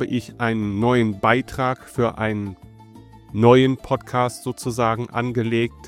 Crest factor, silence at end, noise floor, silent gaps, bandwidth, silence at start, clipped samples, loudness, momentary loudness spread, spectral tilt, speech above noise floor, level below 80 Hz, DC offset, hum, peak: 20 dB; 0 s; -45 dBFS; none; 15.5 kHz; 0 s; under 0.1%; -21 LUFS; 10 LU; -6.5 dB/octave; 24 dB; -50 dBFS; under 0.1%; none; -2 dBFS